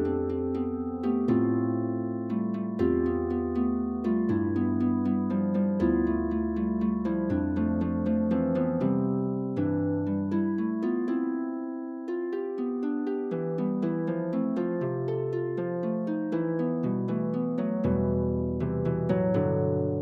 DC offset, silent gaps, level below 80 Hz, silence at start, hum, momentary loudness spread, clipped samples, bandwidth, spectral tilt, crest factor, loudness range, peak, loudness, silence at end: under 0.1%; none; -48 dBFS; 0 s; none; 5 LU; under 0.1%; 4.9 kHz; -11 dB/octave; 14 dB; 3 LU; -14 dBFS; -28 LUFS; 0 s